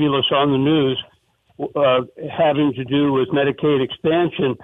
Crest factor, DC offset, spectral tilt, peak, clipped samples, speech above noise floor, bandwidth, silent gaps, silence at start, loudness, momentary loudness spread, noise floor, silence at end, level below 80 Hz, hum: 14 dB; under 0.1%; -8.5 dB/octave; -6 dBFS; under 0.1%; 41 dB; 3.9 kHz; none; 0 s; -18 LUFS; 6 LU; -59 dBFS; 0 s; -54 dBFS; none